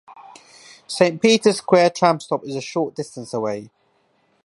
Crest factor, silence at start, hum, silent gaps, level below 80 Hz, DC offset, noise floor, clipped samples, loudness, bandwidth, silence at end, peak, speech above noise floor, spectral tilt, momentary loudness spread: 20 dB; 0.1 s; none; none; -70 dBFS; under 0.1%; -63 dBFS; under 0.1%; -19 LUFS; 11.5 kHz; 0.8 s; 0 dBFS; 44 dB; -4.5 dB/octave; 13 LU